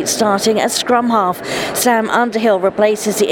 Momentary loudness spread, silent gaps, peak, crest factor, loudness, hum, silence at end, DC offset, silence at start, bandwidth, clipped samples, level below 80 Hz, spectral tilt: 3 LU; none; 0 dBFS; 14 dB; -14 LUFS; none; 0 s; under 0.1%; 0 s; 19.5 kHz; under 0.1%; -54 dBFS; -3 dB/octave